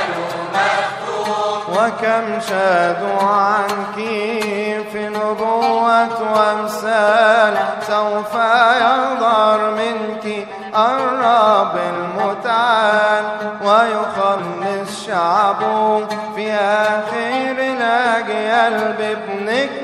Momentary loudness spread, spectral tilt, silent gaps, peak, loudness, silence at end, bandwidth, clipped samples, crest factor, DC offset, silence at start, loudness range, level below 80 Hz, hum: 9 LU; -4 dB/octave; none; 0 dBFS; -16 LUFS; 0 s; 15 kHz; under 0.1%; 16 dB; under 0.1%; 0 s; 3 LU; -64 dBFS; none